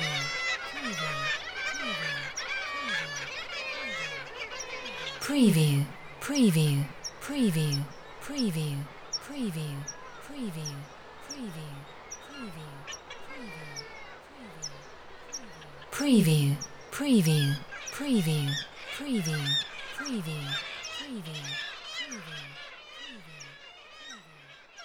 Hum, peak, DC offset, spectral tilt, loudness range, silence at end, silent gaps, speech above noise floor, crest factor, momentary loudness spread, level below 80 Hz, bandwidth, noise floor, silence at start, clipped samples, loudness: none; -12 dBFS; under 0.1%; -4.5 dB/octave; 14 LU; 0 s; none; 25 dB; 20 dB; 20 LU; -60 dBFS; 19 kHz; -53 dBFS; 0 s; under 0.1%; -31 LUFS